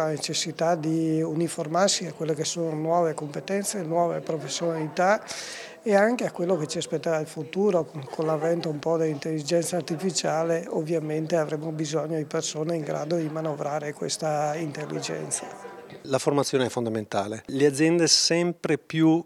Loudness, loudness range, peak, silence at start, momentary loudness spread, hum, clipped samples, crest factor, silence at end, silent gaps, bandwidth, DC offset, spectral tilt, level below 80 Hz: -26 LUFS; 5 LU; -4 dBFS; 0 s; 9 LU; none; under 0.1%; 22 dB; 0.05 s; none; 14.5 kHz; under 0.1%; -4 dB/octave; -74 dBFS